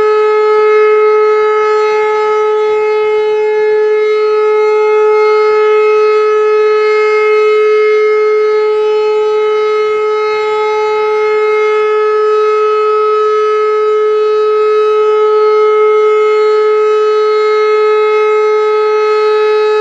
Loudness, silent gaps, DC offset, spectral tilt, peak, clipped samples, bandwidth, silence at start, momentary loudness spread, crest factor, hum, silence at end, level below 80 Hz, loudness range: -10 LUFS; none; under 0.1%; -2.5 dB/octave; 0 dBFS; under 0.1%; 7.6 kHz; 0 s; 3 LU; 8 dB; none; 0 s; -62 dBFS; 2 LU